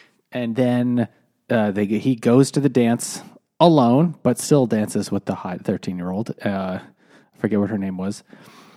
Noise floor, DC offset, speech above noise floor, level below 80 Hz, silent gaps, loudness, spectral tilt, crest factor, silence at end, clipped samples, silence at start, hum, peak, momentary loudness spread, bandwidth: -52 dBFS; under 0.1%; 33 dB; -66 dBFS; none; -20 LUFS; -6.5 dB/octave; 20 dB; 0.55 s; under 0.1%; 0.3 s; none; 0 dBFS; 12 LU; 15 kHz